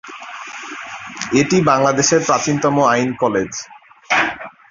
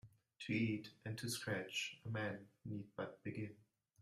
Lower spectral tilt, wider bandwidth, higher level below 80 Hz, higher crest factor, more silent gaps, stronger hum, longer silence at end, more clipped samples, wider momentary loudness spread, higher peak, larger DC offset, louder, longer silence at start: about the same, -4 dB/octave vs -4.5 dB/octave; second, 7.6 kHz vs 14 kHz; first, -54 dBFS vs -78 dBFS; about the same, 16 dB vs 18 dB; neither; neither; second, 0.2 s vs 0.4 s; neither; first, 17 LU vs 10 LU; first, -2 dBFS vs -28 dBFS; neither; first, -16 LUFS vs -45 LUFS; about the same, 0.05 s vs 0.05 s